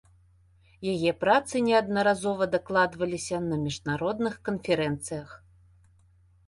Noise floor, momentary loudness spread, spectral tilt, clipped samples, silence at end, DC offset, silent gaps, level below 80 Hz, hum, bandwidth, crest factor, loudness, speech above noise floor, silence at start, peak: -60 dBFS; 10 LU; -5 dB/octave; under 0.1%; 1.1 s; under 0.1%; none; -58 dBFS; none; 11.5 kHz; 20 dB; -27 LUFS; 34 dB; 0.8 s; -8 dBFS